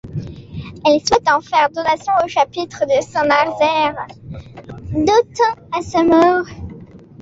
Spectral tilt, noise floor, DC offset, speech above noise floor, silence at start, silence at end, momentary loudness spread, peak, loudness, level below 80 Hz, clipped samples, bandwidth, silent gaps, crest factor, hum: -4.5 dB/octave; -38 dBFS; under 0.1%; 22 dB; 0.05 s; 0 s; 19 LU; -2 dBFS; -16 LUFS; -44 dBFS; under 0.1%; 8 kHz; none; 16 dB; none